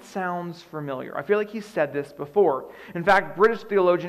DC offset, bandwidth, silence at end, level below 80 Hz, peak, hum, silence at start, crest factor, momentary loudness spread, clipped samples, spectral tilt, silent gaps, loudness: under 0.1%; 12.5 kHz; 0 s; -60 dBFS; -8 dBFS; none; 0 s; 16 dB; 12 LU; under 0.1%; -6.5 dB/octave; none; -24 LUFS